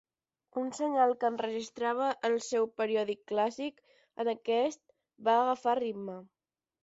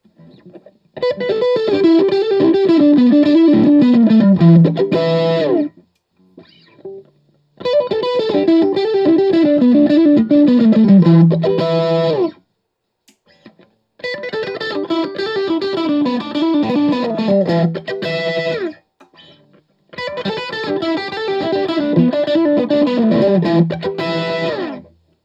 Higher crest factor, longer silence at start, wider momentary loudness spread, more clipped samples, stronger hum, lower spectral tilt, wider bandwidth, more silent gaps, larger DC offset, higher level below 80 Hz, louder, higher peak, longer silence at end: about the same, 18 dB vs 14 dB; about the same, 0.55 s vs 0.45 s; about the same, 13 LU vs 12 LU; neither; neither; second, -4 dB/octave vs -8.5 dB/octave; about the same, 8 kHz vs 7.4 kHz; neither; neither; second, -80 dBFS vs -60 dBFS; second, -32 LUFS vs -14 LUFS; second, -14 dBFS vs 0 dBFS; first, 0.6 s vs 0.45 s